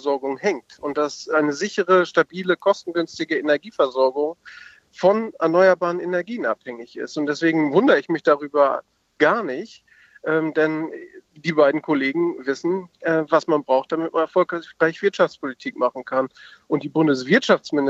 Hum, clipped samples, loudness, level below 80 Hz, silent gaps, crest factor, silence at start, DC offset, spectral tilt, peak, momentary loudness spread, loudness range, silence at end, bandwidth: none; under 0.1%; -21 LUFS; -74 dBFS; none; 18 dB; 0.05 s; under 0.1%; -5.5 dB/octave; -2 dBFS; 11 LU; 2 LU; 0 s; 8 kHz